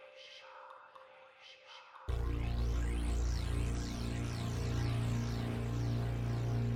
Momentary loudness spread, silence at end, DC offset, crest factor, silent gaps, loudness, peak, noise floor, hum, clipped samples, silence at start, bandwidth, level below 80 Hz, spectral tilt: 19 LU; 0 s; under 0.1%; 12 dB; none; -37 LUFS; -24 dBFS; -58 dBFS; none; under 0.1%; 0 s; 14.5 kHz; -40 dBFS; -6.5 dB/octave